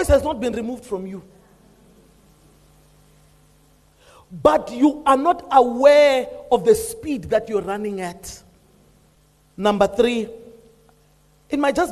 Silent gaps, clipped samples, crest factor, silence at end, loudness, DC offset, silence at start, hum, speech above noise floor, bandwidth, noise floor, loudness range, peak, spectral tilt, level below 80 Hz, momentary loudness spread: none; under 0.1%; 20 dB; 0 s; -19 LUFS; under 0.1%; 0 s; 50 Hz at -60 dBFS; 38 dB; 13 kHz; -57 dBFS; 11 LU; -2 dBFS; -5 dB/octave; -42 dBFS; 17 LU